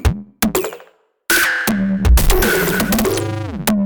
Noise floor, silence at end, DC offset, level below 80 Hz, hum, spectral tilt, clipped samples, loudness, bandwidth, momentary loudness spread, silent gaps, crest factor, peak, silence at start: -48 dBFS; 0 s; under 0.1%; -22 dBFS; none; -4.5 dB/octave; under 0.1%; -16 LUFS; over 20 kHz; 8 LU; none; 14 dB; -2 dBFS; 0 s